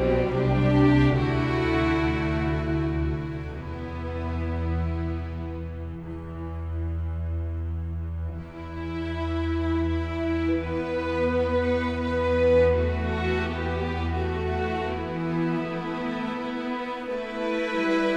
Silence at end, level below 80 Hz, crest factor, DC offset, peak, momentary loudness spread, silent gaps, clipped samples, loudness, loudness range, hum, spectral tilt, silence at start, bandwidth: 0 s; -36 dBFS; 18 dB; under 0.1%; -8 dBFS; 12 LU; none; under 0.1%; -27 LUFS; 8 LU; none; -8 dB/octave; 0 s; 8.4 kHz